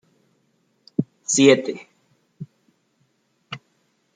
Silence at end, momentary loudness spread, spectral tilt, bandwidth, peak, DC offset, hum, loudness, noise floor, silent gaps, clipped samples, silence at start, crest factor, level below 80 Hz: 0.6 s; 27 LU; -4 dB/octave; 9.6 kHz; -2 dBFS; under 0.1%; none; -19 LUFS; -67 dBFS; none; under 0.1%; 1 s; 22 dB; -70 dBFS